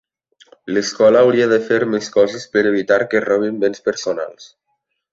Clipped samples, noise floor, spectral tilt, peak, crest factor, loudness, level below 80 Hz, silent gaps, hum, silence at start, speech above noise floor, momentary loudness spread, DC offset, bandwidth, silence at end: under 0.1%; -71 dBFS; -4.5 dB/octave; -2 dBFS; 16 dB; -16 LUFS; -60 dBFS; none; none; 0.65 s; 55 dB; 10 LU; under 0.1%; 7.8 kHz; 0.65 s